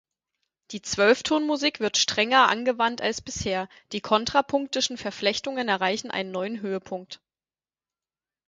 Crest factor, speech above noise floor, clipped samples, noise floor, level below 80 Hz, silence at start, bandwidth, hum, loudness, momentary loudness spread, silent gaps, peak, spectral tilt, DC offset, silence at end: 22 dB; over 65 dB; under 0.1%; under -90 dBFS; -58 dBFS; 0.7 s; 9.6 kHz; none; -24 LUFS; 14 LU; none; -4 dBFS; -2.5 dB/octave; under 0.1%; 1.35 s